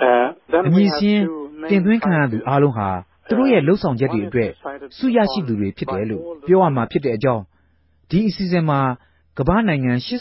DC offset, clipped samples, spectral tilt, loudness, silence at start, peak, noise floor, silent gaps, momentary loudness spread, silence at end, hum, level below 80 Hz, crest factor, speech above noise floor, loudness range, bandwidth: under 0.1%; under 0.1%; -11 dB/octave; -19 LUFS; 0 s; -2 dBFS; -59 dBFS; none; 10 LU; 0 s; none; -44 dBFS; 16 dB; 42 dB; 3 LU; 5.8 kHz